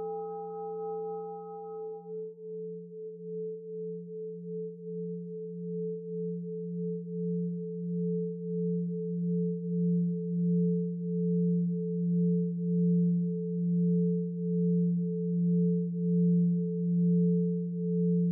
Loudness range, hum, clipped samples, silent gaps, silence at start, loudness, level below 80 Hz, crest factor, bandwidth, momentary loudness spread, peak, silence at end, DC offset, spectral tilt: 11 LU; none; under 0.1%; none; 0 s; -31 LUFS; under -90 dBFS; 10 dB; 1.4 kHz; 13 LU; -20 dBFS; 0 s; under 0.1%; -18.5 dB/octave